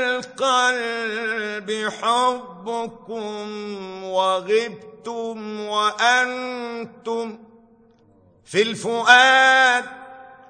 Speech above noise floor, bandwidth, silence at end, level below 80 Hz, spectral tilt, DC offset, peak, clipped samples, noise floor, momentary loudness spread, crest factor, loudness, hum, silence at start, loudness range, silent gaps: 34 dB; 9.4 kHz; 0.15 s; -70 dBFS; -2 dB/octave; under 0.1%; 0 dBFS; under 0.1%; -55 dBFS; 18 LU; 22 dB; -20 LUFS; none; 0 s; 7 LU; none